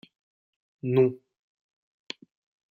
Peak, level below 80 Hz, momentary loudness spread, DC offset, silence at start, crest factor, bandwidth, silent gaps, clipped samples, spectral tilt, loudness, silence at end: -10 dBFS; -72 dBFS; 18 LU; under 0.1%; 0.85 s; 22 dB; 7.4 kHz; none; under 0.1%; -8 dB/octave; -26 LUFS; 1.55 s